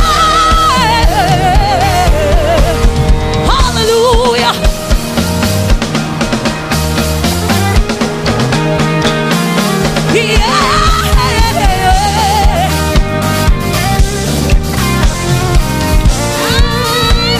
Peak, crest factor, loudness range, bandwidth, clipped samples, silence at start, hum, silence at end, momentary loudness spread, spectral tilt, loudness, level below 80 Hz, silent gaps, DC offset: 0 dBFS; 10 dB; 3 LU; 16 kHz; under 0.1%; 0 s; none; 0 s; 4 LU; -4.5 dB/octave; -11 LUFS; -14 dBFS; none; under 0.1%